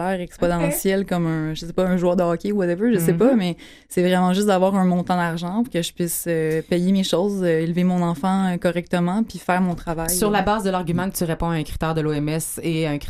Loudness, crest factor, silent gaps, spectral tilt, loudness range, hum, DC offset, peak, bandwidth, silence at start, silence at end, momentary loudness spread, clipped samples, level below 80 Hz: -21 LUFS; 14 dB; none; -5.5 dB/octave; 2 LU; none; under 0.1%; -6 dBFS; 15.5 kHz; 0 s; 0 s; 6 LU; under 0.1%; -42 dBFS